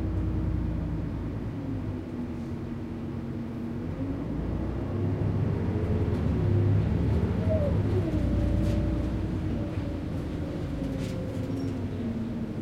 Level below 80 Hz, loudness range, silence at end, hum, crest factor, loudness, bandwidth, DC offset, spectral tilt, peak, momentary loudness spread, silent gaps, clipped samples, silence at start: -36 dBFS; 7 LU; 0 s; none; 14 dB; -30 LUFS; 9.4 kHz; under 0.1%; -9 dB/octave; -14 dBFS; 8 LU; none; under 0.1%; 0 s